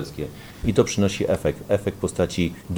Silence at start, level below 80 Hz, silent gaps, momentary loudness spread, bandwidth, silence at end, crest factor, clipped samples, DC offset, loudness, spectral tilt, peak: 0 s; -42 dBFS; none; 10 LU; over 20 kHz; 0 s; 20 dB; under 0.1%; under 0.1%; -23 LUFS; -5.5 dB/octave; -4 dBFS